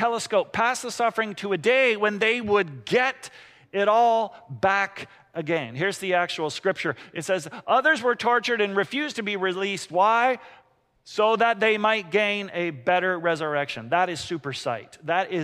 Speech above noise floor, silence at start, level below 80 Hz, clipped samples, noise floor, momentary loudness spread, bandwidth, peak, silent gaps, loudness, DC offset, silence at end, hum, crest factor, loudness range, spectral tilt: 36 dB; 0 s; -68 dBFS; under 0.1%; -60 dBFS; 10 LU; 15 kHz; -8 dBFS; none; -24 LUFS; under 0.1%; 0 s; none; 16 dB; 3 LU; -4 dB/octave